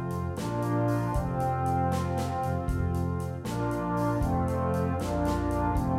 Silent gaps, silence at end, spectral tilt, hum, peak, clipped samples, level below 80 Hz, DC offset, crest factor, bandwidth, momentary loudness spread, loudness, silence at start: none; 0 s; -7.5 dB/octave; none; -16 dBFS; under 0.1%; -40 dBFS; under 0.1%; 12 dB; 16 kHz; 4 LU; -29 LUFS; 0 s